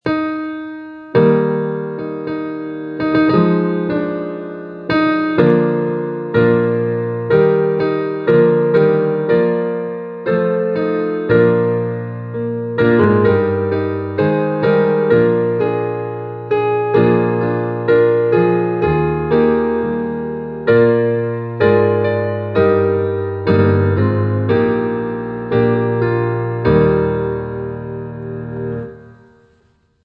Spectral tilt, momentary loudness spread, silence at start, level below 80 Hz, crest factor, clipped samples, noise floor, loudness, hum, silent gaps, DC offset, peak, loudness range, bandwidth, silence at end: -10.5 dB/octave; 11 LU; 0.05 s; -44 dBFS; 16 dB; under 0.1%; -57 dBFS; -16 LUFS; none; none; under 0.1%; 0 dBFS; 3 LU; 5.2 kHz; 0.9 s